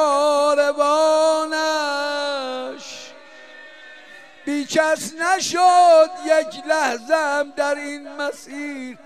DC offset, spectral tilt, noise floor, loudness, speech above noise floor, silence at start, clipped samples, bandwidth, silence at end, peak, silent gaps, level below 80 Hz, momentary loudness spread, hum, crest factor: 0.2%; -1.5 dB/octave; -44 dBFS; -19 LUFS; 25 dB; 0 s; under 0.1%; 14.5 kHz; 0.1 s; -4 dBFS; none; -72 dBFS; 16 LU; none; 16 dB